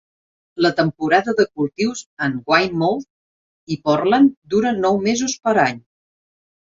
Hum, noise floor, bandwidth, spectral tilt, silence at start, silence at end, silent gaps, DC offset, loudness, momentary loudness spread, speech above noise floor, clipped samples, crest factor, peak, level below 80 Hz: none; under -90 dBFS; 7.8 kHz; -5 dB/octave; 0.55 s; 0.85 s; 2.06-2.17 s, 3.10-3.67 s, 4.37-4.42 s; under 0.1%; -18 LUFS; 8 LU; over 72 dB; under 0.1%; 18 dB; -2 dBFS; -58 dBFS